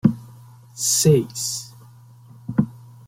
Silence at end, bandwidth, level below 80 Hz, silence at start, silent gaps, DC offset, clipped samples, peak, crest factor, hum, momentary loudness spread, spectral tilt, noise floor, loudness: 0.3 s; 16.5 kHz; -54 dBFS; 0.05 s; none; under 0.1%; under 0.1%; -2 dBFS; 20 dB; none; 22 LU; -5 dB/octave; -46 dBFS; -21 LUFS